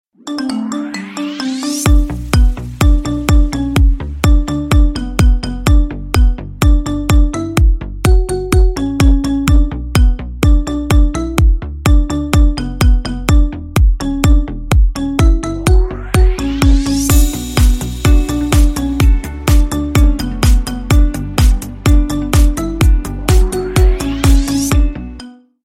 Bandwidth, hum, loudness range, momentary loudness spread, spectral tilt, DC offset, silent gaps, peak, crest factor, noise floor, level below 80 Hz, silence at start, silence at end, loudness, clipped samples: 16 kHz; none; 1 LU; 4 LU; -6 dB/octave; under 0.1%; none; 0 dBFS; 12 dB; -34 dBFS; -12 dBFS; 0.25 s; 0.35 s; -14 LUFS; under 0.1%